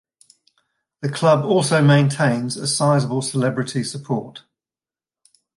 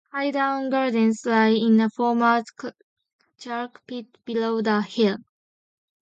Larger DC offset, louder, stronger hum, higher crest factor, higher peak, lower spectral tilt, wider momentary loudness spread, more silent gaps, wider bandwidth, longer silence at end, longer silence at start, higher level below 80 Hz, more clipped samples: neither; first, -19 LUFS vs -22 LUFS; neither; about the same, 16 dB vs 16 dB; first, -4 dBFS vs -8 dBFS; about the same, -5.5 dB/octave vs -6 dB/octave; second, 11 LU vs 17 LU; second, none vs 2.83-2.96 s, 3.13-3.19 s; first, 11.5 kHz vs 7.8 kHz; first, 1.2 s vs 0.85 s; first, 1 s vs 0.15 s; first, -64 dBFS vs -74 dBFS; neither